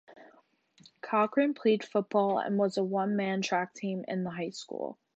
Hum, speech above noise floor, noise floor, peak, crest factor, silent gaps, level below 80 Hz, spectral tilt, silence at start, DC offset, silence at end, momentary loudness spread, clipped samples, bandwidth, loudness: none; 35 dB; -65 dBFS; -14 dBFS; 18 dB; none; -82 dBFS; -6 dB/octave; 0.1 s; under 0.1%; 0.25 s; 10 LU; under 0.1%; 8.2 kHz; -30 LUFS